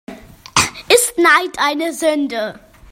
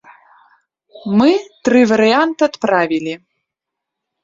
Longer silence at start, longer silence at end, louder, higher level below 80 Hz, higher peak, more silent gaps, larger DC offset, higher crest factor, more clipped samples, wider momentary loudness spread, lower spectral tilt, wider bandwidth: second, 0.1 s vs 0.95 s; second, 0.35 s vs 1.05 s; about the same, -15 LUFS vs -14 LUFS; first, -50 dBFS vs -60 dBFS; about the same, 0 dBFS vs -2 dBFS; neither; neither; about the same, 16 dB vs 16 dB; neither; second, 10 LU vs 13 LU; second, -2 dB/octave vs -5.5 dB/octave; first, 16.5 kHz vs 7.6 kHz